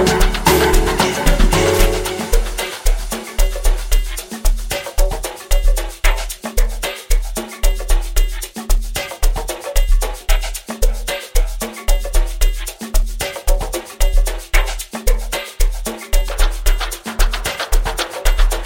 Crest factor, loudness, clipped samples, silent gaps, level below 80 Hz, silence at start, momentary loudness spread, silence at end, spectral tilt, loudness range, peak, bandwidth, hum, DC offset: 16 dB; -20 LUFS; under 0.1%; none; -16 dBFS; 0 s; 9 LU; 0 s; -3.5 dB/octave; 4 LU; 0 dBFS; 17 kHz; none; under 0.1%